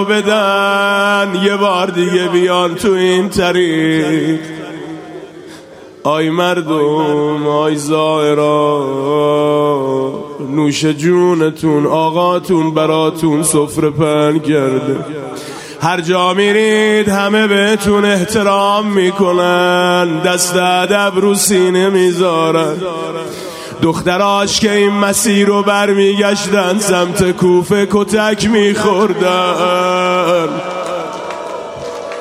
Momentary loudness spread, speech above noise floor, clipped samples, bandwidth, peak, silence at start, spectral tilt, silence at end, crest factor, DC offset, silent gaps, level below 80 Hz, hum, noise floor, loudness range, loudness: 10 LU; 23 dB; under 0.1%; 16 kHz; 0 dBFS; 0 s; -4.5 dB/octave; 0 s; 12 dB; under 0.1%; none; -48 dBFS; none; -35 dBFS; 3 LU; -12 LUFS